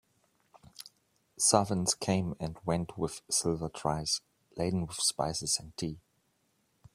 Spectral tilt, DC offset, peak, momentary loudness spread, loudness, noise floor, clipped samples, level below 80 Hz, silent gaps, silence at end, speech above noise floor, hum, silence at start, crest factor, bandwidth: -3.5 dB/octave; under 0.1%; -8 dBFS; 21 LU; -31 LUFS; -74 dBFS; under 0.1%; -58 dBFS; none; 0.95 s; 43 dB; none; 0.8 s; 26 dB; 15.5 kHz